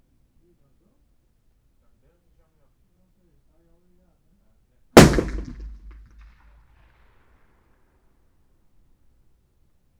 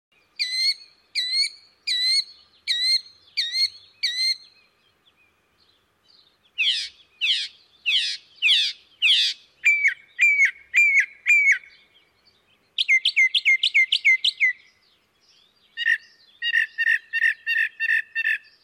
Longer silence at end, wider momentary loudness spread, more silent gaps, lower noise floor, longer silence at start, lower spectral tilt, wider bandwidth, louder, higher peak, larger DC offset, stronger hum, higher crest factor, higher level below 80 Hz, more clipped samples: first, 4.3 s vs 0.25 s; first, 29 LU vs 12 LU; neither; about the same, -63 dBFS vs -63 dBFS; first, 4.95 s vs 0.4 s; first, -5 dB/octave vs 5.5 dB/octave; first, over 20 kHz vs 16.5 kHz; first, -16 LUFS vs -20 LUFS; first, 0 dBFS vs -10 dBFS; neither; neither; first, 26 dB vs 14 dB; first, -38 dBFS vs -78 dBFS; neither